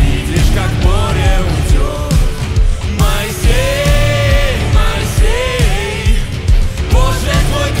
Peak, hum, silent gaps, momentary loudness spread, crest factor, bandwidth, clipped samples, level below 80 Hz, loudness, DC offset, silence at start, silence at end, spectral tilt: 0 dBFS; none; none; 4 LU; 10 dB; 16 kHz; under 0.1%; -14 dBFS; -14 LUFS; 0.2%; 0 s; 0 s; -5 dB/octave